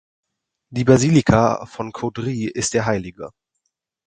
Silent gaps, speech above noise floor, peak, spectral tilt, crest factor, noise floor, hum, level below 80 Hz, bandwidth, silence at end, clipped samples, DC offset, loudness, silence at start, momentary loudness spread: none; 57 dB; 0 dBFS; -6 dB/octave; 20 dB; -76 dBFS; none; -44 dBFS; 9.6 kHz; 0.75 s; under 0.1%; under 0.1%; -19 LUFS; 0.7 s; 17 LU